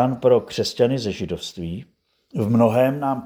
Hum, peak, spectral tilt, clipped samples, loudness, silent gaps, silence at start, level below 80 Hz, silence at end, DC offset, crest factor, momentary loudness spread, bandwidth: none; -4 dBFS; -6.5 dB/octave; under 0.1%; -21 LUFS; none; 0 s; -54 dBFS; 0 s; under 0.1%; 18 dB; 14 LU; over 20 kHz